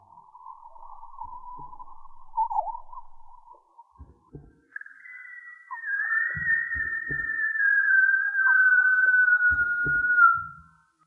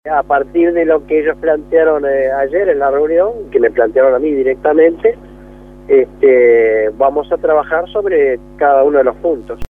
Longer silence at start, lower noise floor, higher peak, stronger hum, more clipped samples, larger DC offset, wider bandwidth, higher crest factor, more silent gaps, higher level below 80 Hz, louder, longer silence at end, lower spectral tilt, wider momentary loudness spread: about the same, 0.15 s vs 0.05 s; first, -55 dBFS vs -35 dBFS; second, -8 dBFS vs 0 dBFS; neither; neither; neither; second, 2.2 kHz vs 3.7 kHz; first, 18 dB vs 12 dB; neither; second, -54 dBFS vs -40 dBFS; second, -22 LUFS vs -12 LUFS; first, 0.45 s vs 0.05 s; about the same, -7 dB/octave vs -8 dB/octave; first, 24 LU vs 6 LU